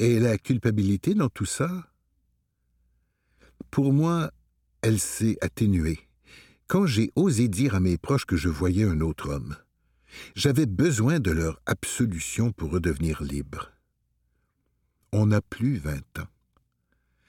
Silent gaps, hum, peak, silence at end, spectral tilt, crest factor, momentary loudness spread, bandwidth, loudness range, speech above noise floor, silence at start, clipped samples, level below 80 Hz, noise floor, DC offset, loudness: none; none; -8 dBFS; 1 s; -6 dB/octave; 18 dB; 12 LU; 17 kHz; 5 LU; 49 dB; 0 s; under 0.1%; -44 dBFS; -73 dBFS; under 0.1%; -25 LUFS